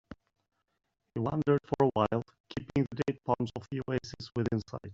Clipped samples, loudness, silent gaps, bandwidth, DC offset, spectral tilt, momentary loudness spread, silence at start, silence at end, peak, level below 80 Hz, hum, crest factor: under 0.1%; -33 LUFS; 2.40-2.44 s; 7.8 kHz; under 0.1%; -7 dB/octave; 11 LU; 0.1 s; 0 s; -12 dBFS; -60 dBFS; none; 20 dB